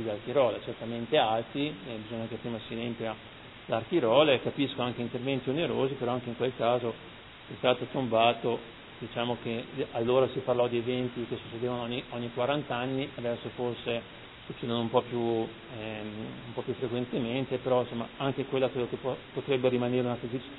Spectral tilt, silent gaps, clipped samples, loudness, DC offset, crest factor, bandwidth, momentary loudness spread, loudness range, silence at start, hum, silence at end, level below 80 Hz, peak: -9.5 dB/octave; none; under 0.1%; -31 LUFS; under 0.1%; 22 dB; 4.1 kHz; 12 LU; 4 LU; 0 s; none; 0 s; -62 dBFS; -8 dBFS